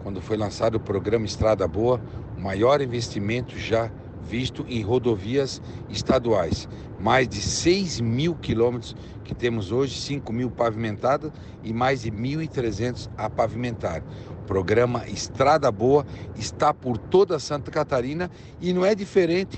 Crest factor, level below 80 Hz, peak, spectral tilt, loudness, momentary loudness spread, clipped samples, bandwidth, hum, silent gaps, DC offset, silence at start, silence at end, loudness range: 16 dB; -46 dBFS; -8 dBFS; -5.5 dB/octave; -24 LUFS; 11 LU; under 0.1%; 9 kHz; none; none; under 0.1%; 0 s; 0 s; 4 LU